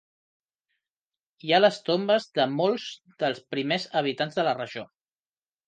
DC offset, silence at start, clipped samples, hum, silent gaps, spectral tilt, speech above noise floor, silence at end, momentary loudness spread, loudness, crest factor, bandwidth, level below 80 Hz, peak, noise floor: under 0.1%; 1.45 s; under 0.1%; none; none; -5 dB/octave; over 64 dB; 0.85 s; 13 LU; -25 LUFS; 20 dB; 9.2 kHz; -78 dBFS; -8 dBFS; under -90 dBFS